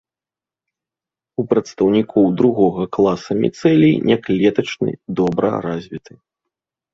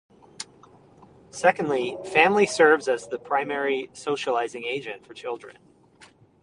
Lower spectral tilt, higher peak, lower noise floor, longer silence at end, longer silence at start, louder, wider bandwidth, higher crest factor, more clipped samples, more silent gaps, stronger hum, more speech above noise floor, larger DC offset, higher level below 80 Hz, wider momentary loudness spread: first, -7.5 dB/octave vs -3.5 dB/octave; about the same, -2 dBFS vs -2 dBFS; first, -90 dBFS vs -55 dBFS; about the same, 0.95 s vs 0.9 s; first, 1.4 s vs 0.4 s; first, -17 LUFS vs -23 LUFS; second, 7.8 kHz vs 11 kHz; second, 16 dB vs 24 dB; neither; neither; neither; first, 73 dB vs 31 dB; neither; first, -54 dBFS vs -70 dBFS; second, 12 LU vs 20 LU